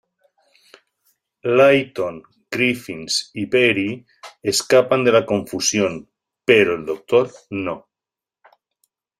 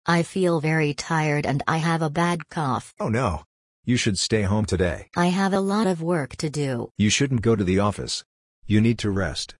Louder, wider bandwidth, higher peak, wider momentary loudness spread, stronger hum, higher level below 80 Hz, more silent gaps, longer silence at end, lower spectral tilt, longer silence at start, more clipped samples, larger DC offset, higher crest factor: first, -18 LUFS vs -23 LUFS; first, 15 kHz vs 11 kHz; first, -2 dBFS vs -6 dBFS; first, 13 LU vs 6 LU; neither; second, -60 dBFS vs -48 dBFS; second, none vs 3.46-3.83 s, 6.91-6.95 s, 8.25-8.62 s; first, 1.4 s vs 0.05 s; second, -3.5 dB/octave vs -5.5 dB/octave; first, 1.45 s vs 0.05 s; neither; neither; about the same, 20 dB vs 18 dB